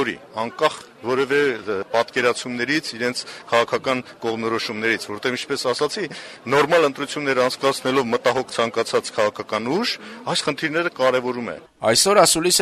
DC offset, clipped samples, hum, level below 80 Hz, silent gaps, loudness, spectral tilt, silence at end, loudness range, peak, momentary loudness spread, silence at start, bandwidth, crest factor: under 0.1%; under 0.1%; none; -60 dBFS; none; -21 LUFS; -2.5 dB/octave; 0 s; 3 LU; -2 dBFS; 10 LU; 0 s; 14 kHz; 20 dB